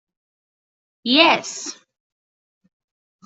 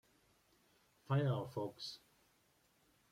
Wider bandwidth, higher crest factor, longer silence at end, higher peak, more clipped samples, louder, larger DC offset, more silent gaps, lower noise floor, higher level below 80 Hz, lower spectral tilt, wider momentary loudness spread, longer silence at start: second, 8.2 kHz vs 14.5 kHz; about the same, 22 dB vs 18 dB; first, 1.55 s vs 1.15 s; first, -2 dBFS vs -26 dBFS; neither; first, -16 LUFS vs -41 LUFS; neither; neither; first, under -90 dBFS vs -75 dBFS; about the same, -74 dBFS vs -78 dBFS; second, -1.5 dB/octave vs -7 dB/octave; first, 17 LU vs 13 LU; about the same, 1.05 s vs 1.1 s